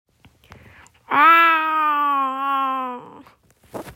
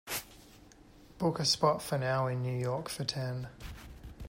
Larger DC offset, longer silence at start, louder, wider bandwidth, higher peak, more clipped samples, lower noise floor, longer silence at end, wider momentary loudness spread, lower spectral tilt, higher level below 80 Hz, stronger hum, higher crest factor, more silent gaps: neither; first, 1.1 s vs 0.05 s; first, -17 LUFS vs -32 LUFS; about the same, 16.5 kHz vs 16 kHz; first, -2 dBFS vs -16 dBFS; neither; second, -53 dBFS vs -57 dBFS; about the same, 0.05 s vs 0 s; first, 23 LU vs 20 LU; about the same, -3.5 dB/octave vs -4.5 dB/octave; second, -62 dBFS vs -56 dBFS; neither; about the same, 18 dB vs 20 dB; neither